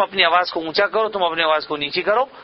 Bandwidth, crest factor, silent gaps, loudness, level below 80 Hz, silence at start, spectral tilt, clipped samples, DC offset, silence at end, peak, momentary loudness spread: 6 kHz; 18 dB; none; -19 LUFS; -58 dBFS; 0 s; -5.5 dB/octave; under 0.1%; under 0.1%; 0 s; 0 dBFS; 6 LU